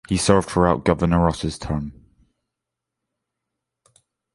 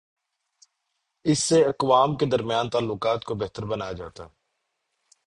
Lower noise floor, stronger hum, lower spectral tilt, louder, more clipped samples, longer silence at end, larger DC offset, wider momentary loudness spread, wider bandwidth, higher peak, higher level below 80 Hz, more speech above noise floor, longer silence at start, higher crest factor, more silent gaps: first, -84 dBFS vs -78 dBFS; neither; about the same, -6 dB/octave vs -5 dB/octave; first, -20 LUFS vs -24 LUFS; neither; first, 2.45 s vs 1 s; neither; about the same, 10 LU vs 11 LU; about the same, 11.5 kHz vs 11.5 kHz; first, 0 dBFS vs -6 dBFS; first, -38 dBFS vs -56 dBFS; first, 64 dB vs 55 dB; second, 0.1 s vs 1.25 s; about the same, 22 dB vs 20 dB; neither